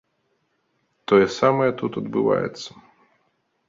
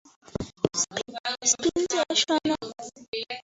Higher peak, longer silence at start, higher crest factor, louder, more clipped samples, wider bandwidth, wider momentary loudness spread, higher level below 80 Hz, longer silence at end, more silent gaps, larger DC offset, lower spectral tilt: about the same, -4 dBFS vs -6 dBFS; first, 1.1 s vs 0.35 s; about the same, 20 dB vs 22 dB; first, -21 LUFS vs -26 LUFS; neither; about the same, 7.6 kHz vs 8 kHz; first, 19 LU vs 14 LU; about the same, -60 dBFS vs -56 dBFS; first, 1 s vs 0.05 s; second, none vs 1.20-1.24 s, 3.08-3.13 s; neither; first, -6 dB/octave vs -2 dB/octave